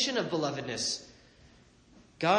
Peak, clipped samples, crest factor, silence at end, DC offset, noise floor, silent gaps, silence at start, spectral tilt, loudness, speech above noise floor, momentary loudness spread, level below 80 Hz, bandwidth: -12 dBFS; under 0.1%; 20 dB; 0 s; under 0.1%; -59 dBFS; none; 0 s; -3 dB/octave; -32 LUFS; 27 dB; 8 LU; -66 dBFS; 10 kHz